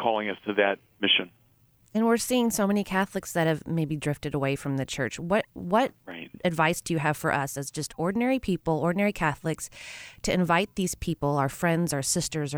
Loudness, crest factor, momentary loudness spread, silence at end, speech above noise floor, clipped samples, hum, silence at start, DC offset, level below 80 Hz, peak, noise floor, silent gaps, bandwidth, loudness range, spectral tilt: -27 LUFS; 18 dB; 8 LU; 0 s; 35 dB; under 0.1%; none; 0 s; under 0.1%; -52 dBFS; -10 dBFS; -62 dBFS; none; over 20 kHz; 2 LU; -4.5 dB/octave